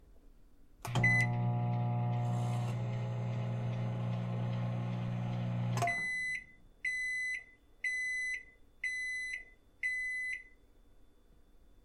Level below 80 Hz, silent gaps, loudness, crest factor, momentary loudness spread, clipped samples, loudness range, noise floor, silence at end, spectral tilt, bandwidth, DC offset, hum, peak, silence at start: -60 dBFS; none; -35 LUFS; 18 dB; 7 LU; under 0.1%; 4 LU; -62 dBFS; 0.05 s; -6 dB/octave; 12.5 kHz; under 0.1%; none; -18 dBFS; 0.05 s